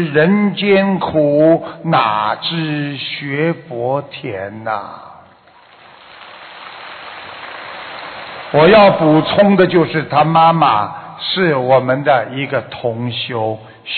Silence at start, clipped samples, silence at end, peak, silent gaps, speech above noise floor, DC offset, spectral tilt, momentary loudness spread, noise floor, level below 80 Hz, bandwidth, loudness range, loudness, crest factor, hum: 0 s; under 0.1%; 0 s; 0 dBFS; none; 32 dB; under 0.1%; -11 dB/octave; 19 LU; -45 dBFS; -52 dBFS; 4.7 kHz; 18 LU; -14 LUFS; 14 dB; none